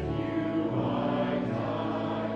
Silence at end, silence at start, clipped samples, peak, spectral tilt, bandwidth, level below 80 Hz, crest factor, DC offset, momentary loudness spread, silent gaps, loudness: 0 s; 0 s; under 0.1%; -18 dBFS; -8.5 dB/octave; 7.4 kHz; -50 dBFS; 12 dB; under 0.1%; 2 LU; none; -30 LUFS